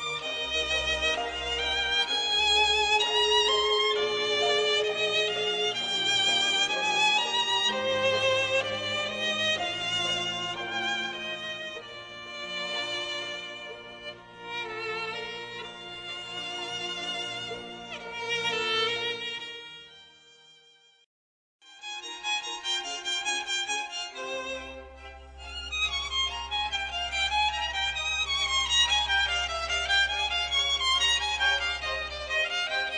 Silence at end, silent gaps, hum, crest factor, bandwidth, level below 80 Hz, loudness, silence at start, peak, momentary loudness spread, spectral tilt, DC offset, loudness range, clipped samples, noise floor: 0 s; 21.06-21.59 s; none; 18 dB; 10 kHz; -52 dBFS; -26 LUFS; 0 s; -12 dBFS; 16 LU; -1 dB/octave; under 0.1%; 11 LU; under 0.1%; -60 dBFS